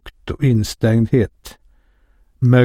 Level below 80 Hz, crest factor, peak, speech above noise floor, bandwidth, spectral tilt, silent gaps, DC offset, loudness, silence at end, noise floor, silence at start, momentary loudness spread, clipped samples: -40 dBFS; 16 dB; -2 dBFS; 38 dB; 15 kHz; -7.5 dB/octave; none; under 0.1%; -17 LUFS; 0 s; -55 dBFS; 0.05 s; 8 LU; under 0.1%